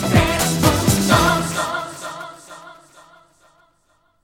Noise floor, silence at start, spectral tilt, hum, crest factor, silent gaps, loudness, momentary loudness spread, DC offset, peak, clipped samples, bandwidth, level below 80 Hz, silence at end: -62 dBFS; 0 s; -4.5 dB/octave; 50 Hz at -50 dBFS; 20 dB; none; -17 LUFS; 22 LU; under 0.1%; -2 dBFS; under 0.1%; 19 kHz; -36 dBFS; 1.5 s